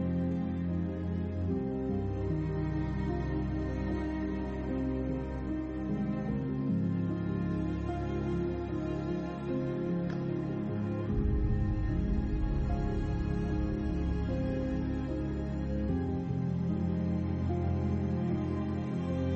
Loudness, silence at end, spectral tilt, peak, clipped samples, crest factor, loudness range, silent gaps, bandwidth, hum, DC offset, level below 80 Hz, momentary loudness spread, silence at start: -34 LUFS; 0 s; -9.5 dB/octave; -20 dBFS; under 0.1%; 12 dB; 2 LU; none; 7.4 kHz; none; under 0.1%; -40 dBFS; 3 LU; 0 s